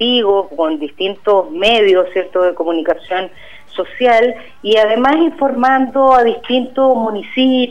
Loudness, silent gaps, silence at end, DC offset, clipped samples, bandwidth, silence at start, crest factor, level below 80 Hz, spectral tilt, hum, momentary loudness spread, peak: -13 LUFS; none; 0 s; 2%; under 0.1%; 9.4 kHz; 0 s; 12 dB; -50 dBFS; -5 dB/octave; none; 9 LU; -2 dBFS